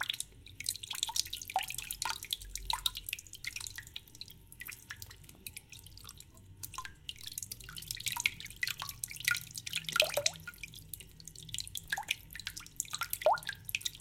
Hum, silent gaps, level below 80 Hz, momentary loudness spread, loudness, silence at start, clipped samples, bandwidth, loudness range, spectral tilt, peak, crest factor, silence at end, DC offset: none; none; -60 dBFS; 17 LU; -37 LUFS; 0 s; under 0.1%; 17 kHz; 12 LU; -0.5 dB/octave; -8 dBFS; 32 dB; 0 s; under 0.1%